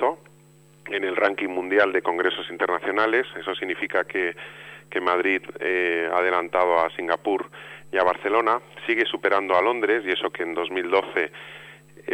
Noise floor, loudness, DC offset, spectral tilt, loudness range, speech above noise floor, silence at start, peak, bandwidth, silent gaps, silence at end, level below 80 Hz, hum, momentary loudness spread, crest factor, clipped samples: -53 dBFS; -23 LUFS; under 0.1%; -4.5 dB/octave; 2 LU; 29 dB; 0 s; -8 dBFS; 10.5 kHz; none; 0 s; -68 dBFS; none; 10 LU; 16 dB; under 0.1%